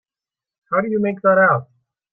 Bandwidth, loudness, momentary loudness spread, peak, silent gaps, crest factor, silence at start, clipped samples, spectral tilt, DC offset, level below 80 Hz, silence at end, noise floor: 3.4 kHz; -17 LUFS; 8 LU; -4 dBFS; none; 16 dB; 0.7 s; under 0.1%; -11.5 dB/octave; under 0.1%; -66 dBFS; 0.5 s; -90 dBFS